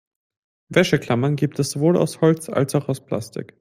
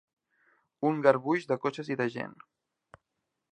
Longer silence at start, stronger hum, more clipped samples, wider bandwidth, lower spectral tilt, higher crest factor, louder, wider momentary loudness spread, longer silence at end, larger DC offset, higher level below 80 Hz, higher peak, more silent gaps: about the same, 0.7 s vs 0.8 s; neither; neither; first, 16 kHz vs 9.2 kHz; about the same, -6 dB/octave vs -7 dB/octave; second, 20 dB vs 26 dB; first, -21 LUFS vs -29 LUFS; about the same, 9 LU vs 11 LU; second, 0.15 s vs 1.2 s; neither; first, -58 dBFS vs -78 dBFS; first, -2 dBFS vs -6 dBFS; neither